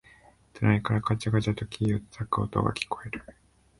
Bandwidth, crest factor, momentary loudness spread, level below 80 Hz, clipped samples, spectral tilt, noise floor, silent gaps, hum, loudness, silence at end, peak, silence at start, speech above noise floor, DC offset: 11.5 kHz; 20 dB; 8 LU; -50 dBFS; under 0.1%; -7 dB/octave; -57 dBFS; none; none; -28 LUFS; 0.5 s; -8 dBFS; 0.55 s; 30 dB; under 0.1%